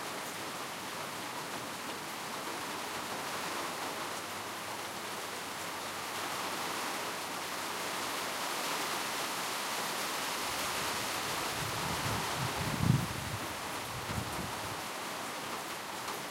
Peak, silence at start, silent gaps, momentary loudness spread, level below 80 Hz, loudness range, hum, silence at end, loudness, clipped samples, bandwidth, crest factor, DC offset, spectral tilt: -14 dBFS; 0 s; none; 6 LU; -60 dBFS; 4 LU; none; 0 s; -36 LUFS; under 0.1%; 16 kHz; 22 dB; under 0.1%; -3 dB/octave